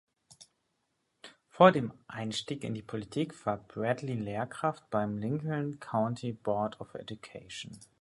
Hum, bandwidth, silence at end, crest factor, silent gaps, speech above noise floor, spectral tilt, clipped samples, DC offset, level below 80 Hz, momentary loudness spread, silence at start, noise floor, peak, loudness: none; 11.5 kHz; 0.15 s; 26 dB; none; 47 dB; -6 dB/octave; under 0.1%; under 0.1%; -68 dBFS; 18 LU; 0.4 s; -79 dBFS; -6 dBFS; -32 LUFS